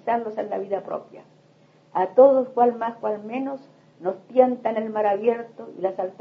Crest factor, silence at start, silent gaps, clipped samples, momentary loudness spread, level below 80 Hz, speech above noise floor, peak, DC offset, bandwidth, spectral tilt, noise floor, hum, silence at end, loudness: 20 dB; 0.05 s; none; under 0.1%; 15 LU; -80 dBFS; 34 dB; -4 dBFS; under 0.1%; 4.9 kHz; -8 dB/octave; -56 dBFS; none; 0.1 s; -23 LUFS